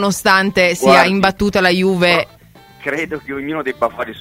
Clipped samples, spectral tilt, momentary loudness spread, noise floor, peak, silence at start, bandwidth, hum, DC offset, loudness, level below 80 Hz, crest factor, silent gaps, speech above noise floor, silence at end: under 0.1%; -4.5 dB/octave; 13 LU; -43 dBFS; 0 dBFS; 0 s; 16 kHz; none; under 0.1%; -14 LUFS; -44 dBFS; 16 dB; none; 28 dB; 0 s